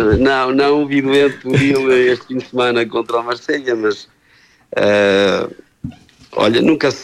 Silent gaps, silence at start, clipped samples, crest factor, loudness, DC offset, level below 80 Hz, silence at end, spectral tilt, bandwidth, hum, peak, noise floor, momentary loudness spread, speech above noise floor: none; 0 s; under 0.1%; 14 dB; -15 LUFS; under 0.1%; -40 dBFS; 0 s; -6 dB/octave; 12.5 kHz; none; -2 dBFS; -51 dBFS; 14 LU; 37 dB